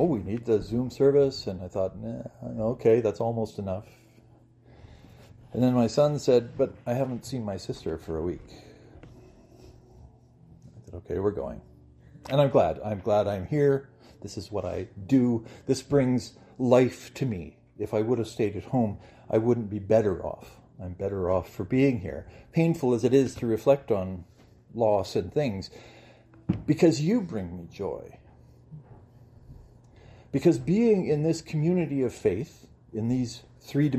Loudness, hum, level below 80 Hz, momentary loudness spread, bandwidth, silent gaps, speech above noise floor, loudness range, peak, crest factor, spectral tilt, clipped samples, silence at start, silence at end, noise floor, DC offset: -27 LUFS; none; -56 dBFS; 15 LU; 14 kHz; none; 30 dB; 8 LU; -6 dBFS; 22 dB; -7.5 dB/octave; under 0.1%; 0 s; 0 s; -56 dBFS; under 0.1%